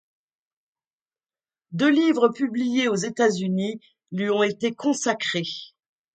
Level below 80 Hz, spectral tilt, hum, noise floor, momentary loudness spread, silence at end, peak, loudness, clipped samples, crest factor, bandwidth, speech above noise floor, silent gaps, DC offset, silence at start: -72 dBFS; -4.5 dB/octave; none; under -90 dBFS; 13 LU; 0.45 s; -4 dBFS; -23 LUFS; under 0.1%; 20 dB; 9.4 kHz; over 67 dB; none; under 0.1%; 1.7 s